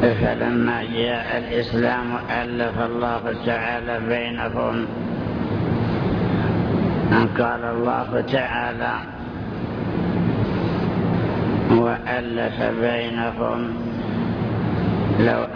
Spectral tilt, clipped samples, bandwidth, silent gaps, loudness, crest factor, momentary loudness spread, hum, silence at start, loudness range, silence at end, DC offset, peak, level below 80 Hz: -9 dB/octave; under 0.1%; 5.4 kHz; none; -22 LUFS; 16 dB; 7 LU; none; 0 s; 2 LU; 0 s; under 0.1%; -4 dBFS; -40 dBFS